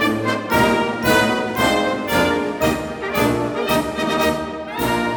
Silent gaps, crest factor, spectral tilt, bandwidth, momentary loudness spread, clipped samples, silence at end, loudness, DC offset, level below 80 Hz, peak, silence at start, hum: none; 16 dB; -4.5 dB/octave; over 20 kHz; 6 LU; under 0.1%; 0 s; -19 LUFS; under 0.1%; -40 dBFS; -2 dBFS; 0 s; none